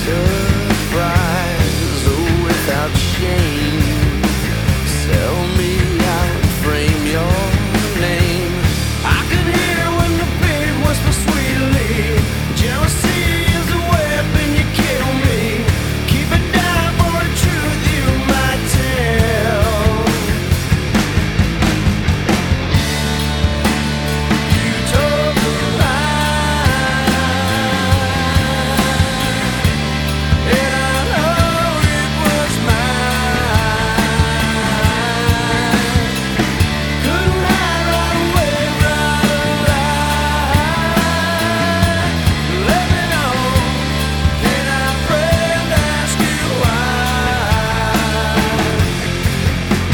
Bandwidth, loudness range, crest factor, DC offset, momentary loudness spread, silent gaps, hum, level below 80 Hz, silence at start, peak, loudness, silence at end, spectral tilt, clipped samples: 19.5 kHz; 1 LU; 14 dB; under 0.1%; 2 LU; none; none; -24 dBFS; 0 s; 0 dBFS; -15 LUFS; 0 s; -5 dB/octave; under 0.1%